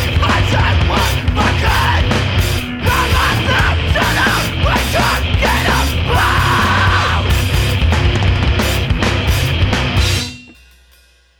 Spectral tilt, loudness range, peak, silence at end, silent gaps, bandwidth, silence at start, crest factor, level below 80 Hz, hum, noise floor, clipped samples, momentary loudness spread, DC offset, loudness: -4.5 dB/octave; 1 LU; -2 dBFS; 0.85 s; none; 20 kHz; 0 s; 12 dB; -20 dBFS; none; -49 dBFS; under 0.1%; 3 LU; under 0.1%; -14 LUFS